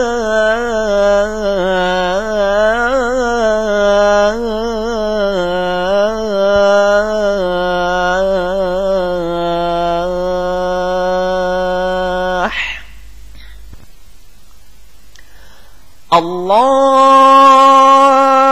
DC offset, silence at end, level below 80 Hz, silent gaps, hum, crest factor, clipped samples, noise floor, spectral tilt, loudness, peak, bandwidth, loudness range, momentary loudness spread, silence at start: 3%; 0 s; -36 dBFS; none; none; 14 dB; under 0.1%; -43 dBFS; -4.5 dB/octave; -12 LUFS; 0 dBFS; 15.5 kHz; 10 LU; 10 LU; 0 s